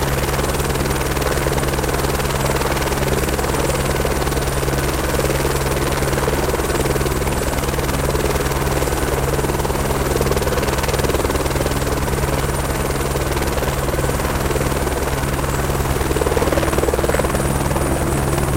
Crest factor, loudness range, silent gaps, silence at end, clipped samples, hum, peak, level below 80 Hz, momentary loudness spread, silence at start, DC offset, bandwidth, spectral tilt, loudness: 14 dB; 1 LU; none; 0 s; under 0.1%; none; -6 dBFS; -24 dBFS; 2 LU; 0 s; under 0.1%; 17 kHz; -4.5 dB/octave; -19 LUFS